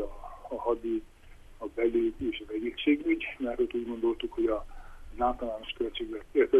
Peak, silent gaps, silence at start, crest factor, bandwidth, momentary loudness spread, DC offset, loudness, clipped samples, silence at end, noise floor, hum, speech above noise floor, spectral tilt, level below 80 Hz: -12 dBFS; none; 0 s; 18 dB; 3.9 kHz; 12 LU; under 0.1%; -31 LUFS; under 0.1%; 0 s; -51 dBFS; none; 21 dB; -6 dB/octave; -48 dBFS